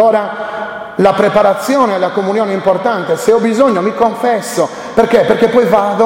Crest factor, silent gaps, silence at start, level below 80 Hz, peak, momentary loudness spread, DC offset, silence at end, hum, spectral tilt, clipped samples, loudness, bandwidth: 12 dB; none; 0 s; -48 dBFS; 0 dBFS; 7 LU; under 0.1%; 0 s; none; -5.5 dB/octave; under 0.1%; -12 LUFS; 16.5 kHz